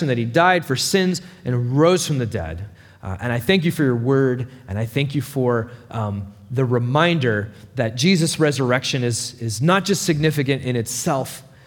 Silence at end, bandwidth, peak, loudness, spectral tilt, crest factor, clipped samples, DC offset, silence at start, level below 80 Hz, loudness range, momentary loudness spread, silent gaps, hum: 0.25 s; over 20 kHz; -2 dBFS; -20 LUFS; -5 dB/octave; 18 dB; under 0.1%; under 0.1%; 0 s; -54 dBFS; 2 LU; 11 LU; none; none